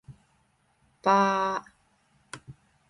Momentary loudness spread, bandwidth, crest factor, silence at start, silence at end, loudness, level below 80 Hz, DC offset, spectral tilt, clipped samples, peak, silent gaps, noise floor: 23 LU; 11.5 kHz; 22 dB; 0.1 s; 0.4 s; -25 LUFS; -68 dBFS; under 0.1%; -5 dB/octave; under 0.1%; -8 dBFS; none; -68 dBFS